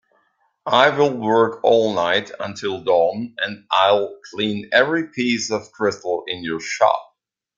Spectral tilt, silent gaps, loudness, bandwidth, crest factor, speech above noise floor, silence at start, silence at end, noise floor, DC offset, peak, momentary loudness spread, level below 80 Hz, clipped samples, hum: -4 dB/octave; none; -19 LUFS; 7.8 kHz; 18 dB; 46 dB; 0.65 s; 0.55 s; -65 dBFS; under 0.1%; -2 dBFS; 10 LU; -64 dBFS; under 0.1%; none